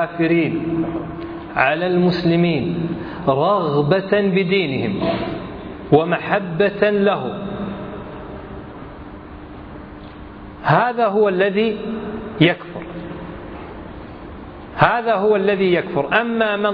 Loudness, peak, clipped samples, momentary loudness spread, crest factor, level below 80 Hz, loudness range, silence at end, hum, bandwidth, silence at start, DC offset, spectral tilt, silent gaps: -18 LUFS; 0 dBFS; under 0.1%; 19 LU; 20 dB; -44 dBFS; 6 LU; 0 s; none; 5.2 kHz; 0 s; under 0.1%; -9 dB/octave; none